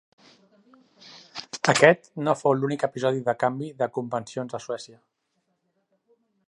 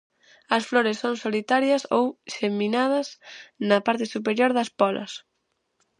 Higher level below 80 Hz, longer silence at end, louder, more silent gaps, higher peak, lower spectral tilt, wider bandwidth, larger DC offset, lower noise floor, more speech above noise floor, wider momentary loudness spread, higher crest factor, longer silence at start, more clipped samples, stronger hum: about the same, -74 dBFS vs -78 dBFS; first, 1.6 s vs 0.8 s; about the same, -24 LUFS vs -24 LUFS; neither; first, 0 dBFS vs -4 dBFS; about the same, -4.5 dB/octave vs -4.5 dB/octave; about the same, 11.5 kHz vs 11 kHz; neither; about the same, -75 dBFS vs -75 dBFS; about the same, 51 dB vs 51 dB; first, 18 LU vs 11 LU; first, 26 dB vs 20 dB; first, 1.05 s vs 0.5 s; neither; neither